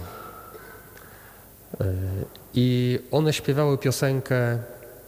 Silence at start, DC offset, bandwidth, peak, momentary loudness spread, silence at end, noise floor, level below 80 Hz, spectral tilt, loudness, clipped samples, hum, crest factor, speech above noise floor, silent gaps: 0 s; under 0.1%; 18.5 kHz; -10 dBFS; 22 LU; 0 s; -48 dBFS; -54 dBFS; -6 dB/octave; -25 LUFS; under 0.1%; none; 16 dB; 24 dB; none